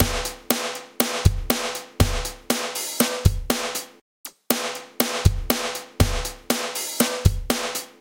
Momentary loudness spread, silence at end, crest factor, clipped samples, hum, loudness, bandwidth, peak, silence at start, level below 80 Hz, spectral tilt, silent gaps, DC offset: 9 LU; 0.1 s; 24 dB; under 0.1%; none; -24 LUFS; 17 kHz; 0 dBFS; 0 s; -30 dBFS; -4 dB/octave; 4.01-4.24 s; under 0.1%